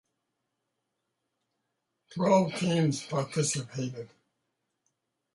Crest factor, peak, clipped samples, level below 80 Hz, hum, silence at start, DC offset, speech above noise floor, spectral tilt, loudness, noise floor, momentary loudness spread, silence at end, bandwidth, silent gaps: 20 dB; -12 dBFS; under 0.1%; -72 dBFS; none; 2.1 s; under 0.1%; 54 dB; -5 dB/octave; -29 LUFS; -82 dBFS; 18 LU; 1.3 s; 11.5 kHz; none